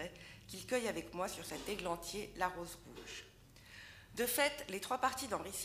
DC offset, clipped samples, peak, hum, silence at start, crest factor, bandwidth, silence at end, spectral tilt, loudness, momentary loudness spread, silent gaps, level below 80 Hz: under 0.1%; under 0.1%; -18 dBFS; none; 0 s; 22 dB; 15.5 kHz; 0 s; -2.5 dB/octave; -40 LUFS; 18 LU; none; -64 dBFS